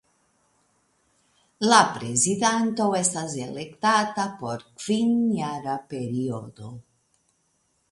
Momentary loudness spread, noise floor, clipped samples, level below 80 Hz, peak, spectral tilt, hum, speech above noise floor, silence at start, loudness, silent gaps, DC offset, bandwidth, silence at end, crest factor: 15 LU; -70 dBFS; under 0.1%; -66 dBFS; -2 dBFS; -3.5 dB/octave; none; 46 dB; 1.6 s; -24 LUFS; none; under 0.1%; 11.5 kHz; 1.1 s; 24 dB